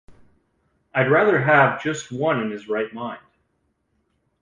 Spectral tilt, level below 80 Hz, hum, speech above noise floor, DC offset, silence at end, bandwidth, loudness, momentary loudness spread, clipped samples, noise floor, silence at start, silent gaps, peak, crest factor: -6 dB/octave; -62 dBFS; none; 50 dB; under 0.1%; 1.25 s; 9.8 kHz; -20 LUFS; 15 LU; under 0.1%; -70 dBFS; 0.1 s; none; -4 dBFS; 18 dB